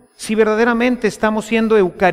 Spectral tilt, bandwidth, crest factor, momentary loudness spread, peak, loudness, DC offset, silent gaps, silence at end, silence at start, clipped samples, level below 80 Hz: -5.5 dB/octave; 14.5 kHz; 12 dB; 4 LU; -2 dBFS; -16 LUFS; under 0.1%; none; 0 s; 0.2 s; under 0.1%; -46 dBFS